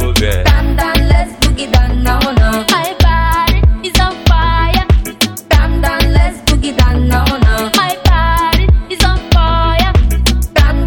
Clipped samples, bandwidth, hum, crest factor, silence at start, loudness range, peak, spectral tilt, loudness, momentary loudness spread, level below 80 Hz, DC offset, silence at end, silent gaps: under 0.1%; 18 kHz; none; 10 dB; 0 s; 1 LU; 0 dBFS; -5 dB/octave; -12 LUFS; 2 LU; -12 dBFS; under 0.1%; 0 s; none